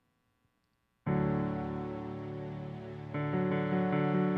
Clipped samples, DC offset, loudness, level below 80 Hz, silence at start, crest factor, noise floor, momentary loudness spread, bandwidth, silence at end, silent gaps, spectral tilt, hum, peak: under 0.1%; under 0.1%; -34 LUFS; -58 dBFS; 1.05 s; 14 dB; -77 dBFS; 12 LU; 4.9 kHz; 0 s; none; -10 dB/octave; none; -20 dBFS